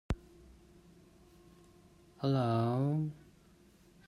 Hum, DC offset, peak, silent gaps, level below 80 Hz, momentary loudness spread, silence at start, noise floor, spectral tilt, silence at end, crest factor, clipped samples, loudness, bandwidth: none; under 0.1%; -20 dBFS; none; -54 dBFS; 11 LU; 0.1 s; -63 dBFS; -8.5 dB/octave; 0.9 s; 18 dB; under 0.1%; -34 LUFS; 12 kHz